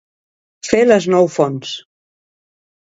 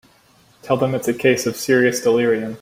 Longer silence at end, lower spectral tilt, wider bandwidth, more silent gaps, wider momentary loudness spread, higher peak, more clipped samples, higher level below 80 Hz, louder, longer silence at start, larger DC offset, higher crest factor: first, 1.1 s vs 0 s; about the same, -5 dB/octave vs -5 dB/octave; second, 8 kHz vs 16.5 kHz; neither; first, 17 LU vs 4 LU; about the same, 0 dBFS vs -2 dBFS; neither; about the same, -56 dBFS vs -58 dBFS; first, -14 LUFS vs -18 LUFS; about the same, 0.65 s vs 0.65 s; neither; about the same, 18 dB vs 16 dB